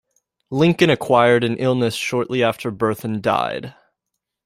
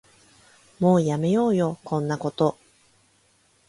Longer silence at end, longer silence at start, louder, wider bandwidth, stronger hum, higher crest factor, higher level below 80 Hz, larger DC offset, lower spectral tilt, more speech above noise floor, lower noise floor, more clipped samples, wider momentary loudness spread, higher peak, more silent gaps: second, 0.75 s vs 1.15 s; second, 0.5 s vs 0.8 s; first, -19 LUFS vs -23 LUFS; first, 16 kHz vs 11.5 kHz; neither; about the same, 18 dB vs 18 dB; first, -56 dBFS vs -64 dBFS; neither; second, -6 dB/octave vs -7.5 dB/octave; first, 62 dB vs 41 dB; first, -80 dBFS vs -63 dBFS; neither; first, 10 LU vs 7 LU; first, -2 dBFS vs -6 dBFS; neither